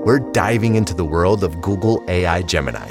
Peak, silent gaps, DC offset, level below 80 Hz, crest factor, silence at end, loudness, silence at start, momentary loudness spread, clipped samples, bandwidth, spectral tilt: -2 dBFS; none; under 0.1%; -38 dBFS; 16 dB; 0 s; -18 LUFS; 0 s; 4 LU; under 0.1%; 16 kHz; -6 dB/octave